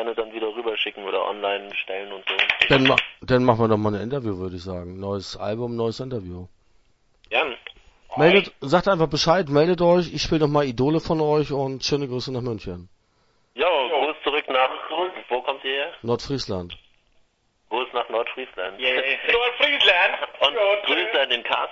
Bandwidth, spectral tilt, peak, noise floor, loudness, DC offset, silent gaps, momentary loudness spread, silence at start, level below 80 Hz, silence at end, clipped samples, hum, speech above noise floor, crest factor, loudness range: 8 kHz; -5 dB/octave; 0 dBFS; -65 dBFS; -22 LUFS; under 0.1%; none; 14 LU; 0 s; -50 dBFS; 0 s; under 0.1%; none; 42 dB; 22 dB; 8 LU